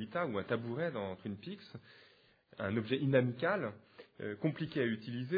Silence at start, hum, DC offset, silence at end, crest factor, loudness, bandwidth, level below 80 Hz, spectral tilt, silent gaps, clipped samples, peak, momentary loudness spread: 0 s; none; under 0.1%; 0 s; 20 dB; -37 LUFS; 5 kHz; -76 dBFS; -5.5 dB/octave; none; under 0.1%; -16 dBFS; 16 LU